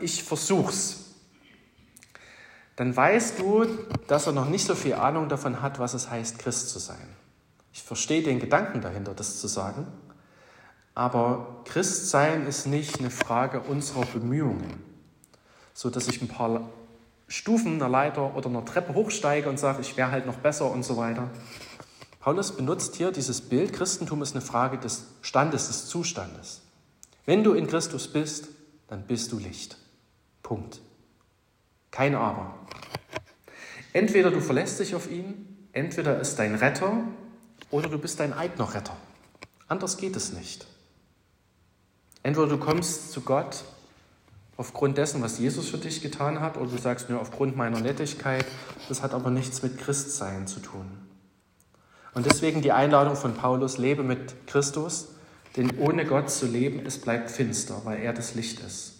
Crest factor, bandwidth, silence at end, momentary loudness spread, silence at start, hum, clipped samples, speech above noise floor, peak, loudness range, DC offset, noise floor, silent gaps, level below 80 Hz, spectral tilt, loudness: 26 dB; 16 kHz; 0.05 s; 16 LU; 0 s; none; under 0.1%; 40 dB; -2 dBFS; 7 LU; under 0.1%; -67 dBFS; none; -64 dBFS; -4.5 dB/octave; -27 LUFS